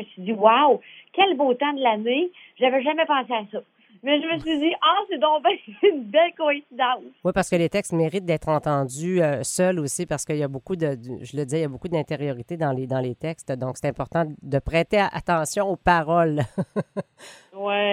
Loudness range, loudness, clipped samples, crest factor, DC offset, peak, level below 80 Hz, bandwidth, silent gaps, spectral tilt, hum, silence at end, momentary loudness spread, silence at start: 6 LU; -23 LUFS; under 0.1%; 22 dB; under 0.1%; -2 dBFS; -50 dBFS; 15.5 kHz; none; -5 dB/octave; none; 0 s; 10 LU; 0 s